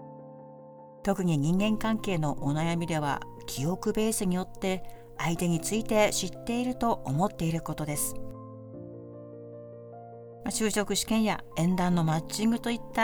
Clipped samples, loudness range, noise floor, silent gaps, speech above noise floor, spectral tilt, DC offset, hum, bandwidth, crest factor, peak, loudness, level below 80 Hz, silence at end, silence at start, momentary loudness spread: under 0.1%; 5 LU; -49 dBFS; none; 20 dB; -5 dB/octave; under 0.1%; none; over 20 kHz; 18 dB; -10 dBFS; -29 LUFS; -48 dBFS; 0 s; 0 s; 19 LU